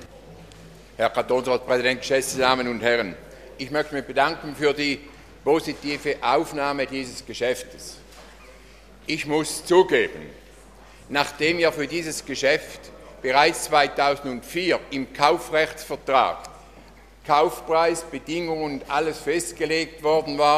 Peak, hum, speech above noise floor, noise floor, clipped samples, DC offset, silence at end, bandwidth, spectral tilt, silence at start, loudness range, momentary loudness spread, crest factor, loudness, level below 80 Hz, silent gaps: 0 dBFS; none; 25 dB; -48 dBFS; under 0.1%; under 0.1%; 0 s; 15 kHz; -3.5 dB/octave; 0 s; 4 LU; 13 LU; 24 dB; -23 LUFS; -52 dBFS; none